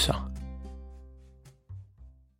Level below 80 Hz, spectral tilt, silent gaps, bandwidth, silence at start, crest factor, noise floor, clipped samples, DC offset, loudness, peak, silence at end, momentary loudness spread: -42 dBFS; -4 dB/octave; none; 16.5 kHz; 0 s; 26 dB; -55 dBFS; under 0.1%; under 0.1%; -37 LUFS; -10 dBFS; 0.25 s; 22 LU